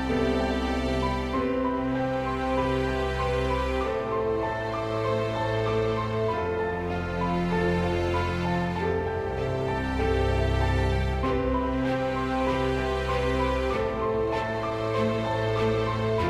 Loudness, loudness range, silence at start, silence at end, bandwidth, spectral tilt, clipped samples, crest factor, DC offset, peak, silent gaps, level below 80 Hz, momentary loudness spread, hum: -27 LUFS; 1 LU; 0 s; 0 s; 12 kHz; -7 dB/octave; under 0.1%; 12 dB; under 0.1%; -14 dBFS; none; -36 dBFS; 3 LU; none